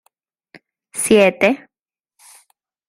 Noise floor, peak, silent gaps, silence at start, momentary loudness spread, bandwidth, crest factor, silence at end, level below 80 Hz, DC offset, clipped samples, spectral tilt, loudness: -90 dBFS; -2 dBFS; none; 0.95 s; 15 LU; 16 kHz; 20 dB; 1.35 s; -56 dBFS; under 0.1%; under 0.1%; -3.5 dB/octave; -15 LUFS